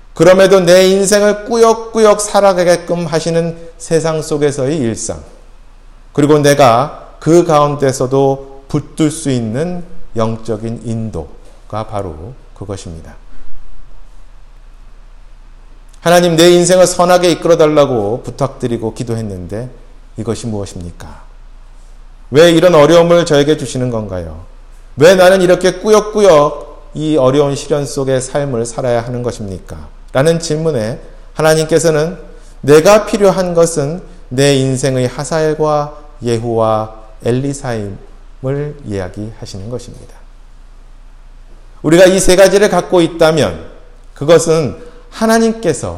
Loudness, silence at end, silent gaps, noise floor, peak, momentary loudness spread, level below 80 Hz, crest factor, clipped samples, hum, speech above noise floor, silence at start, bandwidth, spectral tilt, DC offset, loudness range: -12 LUFS; 0 s; none; -37 dBFS; 0 dBFS; 19 LU; -34 dBFS; 12 dB; 0.3%; none; 25 dB; 0.15 s; 16.5 kHz; -5 dB/octave; under 0.1%; 13 LU